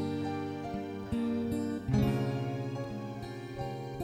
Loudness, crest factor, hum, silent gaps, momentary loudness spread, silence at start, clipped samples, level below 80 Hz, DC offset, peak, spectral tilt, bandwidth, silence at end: -35 LUFS; 18 dB; none; none; 10 LU; 0 s; under 0.1%; -50 dBFS; under 0.1%; -16 dBFS; -7.5 dB/octave; 13.5 kHz; 0 s